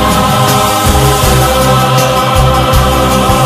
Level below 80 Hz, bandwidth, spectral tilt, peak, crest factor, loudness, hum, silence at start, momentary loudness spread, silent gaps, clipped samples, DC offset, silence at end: -18 dBFS; 16 kHz; -4.5 dB/octave; 0 dBFS; 8 dB; -8 LUFS; none; 0 s; 1 LU; none; 0.2%; under 0.1%; 0 s